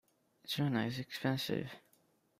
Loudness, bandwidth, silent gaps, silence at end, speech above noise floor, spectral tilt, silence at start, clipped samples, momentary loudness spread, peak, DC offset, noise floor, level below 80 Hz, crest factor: -37 LUFS; 16 kHz; none; 0.6 s; 36 dB; -5.5 dB/octave; 0.45 s; under 0.1%; 16 LU; -18 dBFS; under 0.1%; -73 dBFS; -74 dBFS; 20 dB